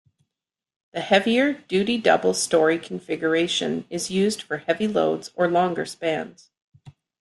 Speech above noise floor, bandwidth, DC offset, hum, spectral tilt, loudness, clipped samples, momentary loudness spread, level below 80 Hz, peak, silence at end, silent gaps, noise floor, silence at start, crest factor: 65 dB; 12.5 kHz; under 0.1%; none; -4 dB/octave; -22 LUFS; under 0.1%; 9 LU; -66 dBFS; -4 dBFS; 0.3 s; 6.64-6.72 s; -88 dBFS; 0.95 s; 20 dB